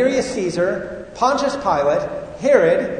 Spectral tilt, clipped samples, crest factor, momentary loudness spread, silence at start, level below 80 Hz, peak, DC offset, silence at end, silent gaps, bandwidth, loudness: -5 dB/octave; under 0.1%; 18 dB; 10 LU; 0 s; -48 dBFS; 0 dBFS; under 0.1%; 0 s; none; 9.6 kHz; -19 LUFS